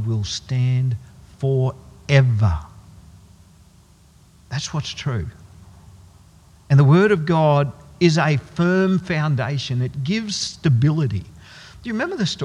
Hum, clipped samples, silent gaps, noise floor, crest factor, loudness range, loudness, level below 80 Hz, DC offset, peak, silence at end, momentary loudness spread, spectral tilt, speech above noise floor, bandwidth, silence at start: none; under 0.1%; none; -51 dBFS; 20 dB; 13 LU; -20 LUFS; -46 dBFS; under 0.1%; 0 dBFS; 0 s; 13 LU; -6.5 dB/octave; 32 dB; 10 kHz; 0 s